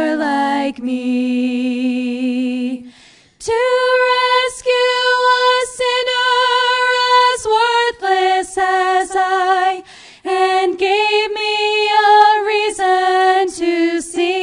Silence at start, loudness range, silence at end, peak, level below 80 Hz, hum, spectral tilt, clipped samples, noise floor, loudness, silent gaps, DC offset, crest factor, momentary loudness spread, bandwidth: 0 s; 4 LU; 0 s; 0 dBFS; -56 dBFS; none; -1.5 dB/octave; under 0.1%; -47 dBFS; -15 LUFS; none; under 0.1%; 16 dB; 7 LU; 11 kHz